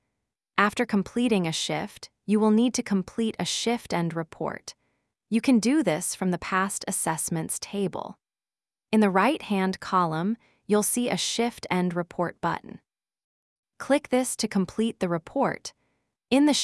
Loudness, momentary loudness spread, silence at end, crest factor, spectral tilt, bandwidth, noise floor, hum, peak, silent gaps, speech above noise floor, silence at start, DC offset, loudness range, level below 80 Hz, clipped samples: -26 LUFS; 10 LU; 0 s; 22 dB; -4.5 dB/octave; 12 kHz; under -90 dBFS; none; -4 dBFS; 13.24-13.63 s; over 65 dB; 0.55 s; under 0.1%; 3 LU; -64 dBFS; under 0.1%